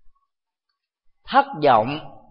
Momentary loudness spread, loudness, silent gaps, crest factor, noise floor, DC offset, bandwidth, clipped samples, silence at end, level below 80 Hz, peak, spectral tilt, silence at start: 11 LU; -19 LUFS; none; 20 dB; -81 dBFS; under 0.1%; 5.6 kHz; under 0.1%; 0.15 s; -58 dBFS; -2 dBFS; -10 dB/octave; 0.05 s